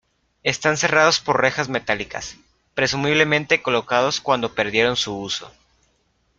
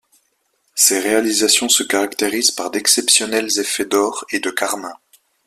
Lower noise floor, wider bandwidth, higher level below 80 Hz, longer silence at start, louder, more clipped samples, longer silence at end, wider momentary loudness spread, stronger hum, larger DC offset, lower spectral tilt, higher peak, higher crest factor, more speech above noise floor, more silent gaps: about the same, -65 dBFS vs -65 dBFS; second, 9.4 kHz vs 16 kHz; first, -54 dBFS vs -62 dBFS; second, 0.45 s vs 0.75 s; second, -20 LUFS vs -16 LUFS; neither; first, 0.9 s vs 0.5 s; about the same, 11 LU vs 9 LU; neither; neither; first, -3 dB/octave vs 0 dB/octave; about the same, -2 dBFS vs 0 dBFS; about the same, 20 dB vs 18 dB; about the same, 45 dB vs 48 dB; neither